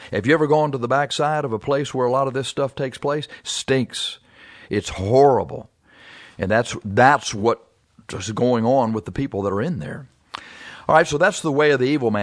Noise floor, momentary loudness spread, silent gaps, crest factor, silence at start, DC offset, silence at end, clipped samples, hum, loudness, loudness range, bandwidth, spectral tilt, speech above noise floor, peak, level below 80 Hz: -46 dBFS; 16 LU; none; 20 dB; 0 s; under 0.1%; 0 s; under 0.1%; none; -20 LUFS; 4 LU; 11 kHz; -5 dB/octave; 26 dB; -2 dBFS; -52 dBFS